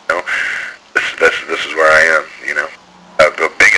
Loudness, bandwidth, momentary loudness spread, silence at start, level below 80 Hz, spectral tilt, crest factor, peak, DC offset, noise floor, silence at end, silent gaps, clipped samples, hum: -13 LUFS; 11 kHz; 10 LU; 0.1 s; -48 dBFS; -1.5 dB/octave; 14 dB; 0 dBFS; under 0.1%; -39 dBFS; 0 s; none; under 0.1%; none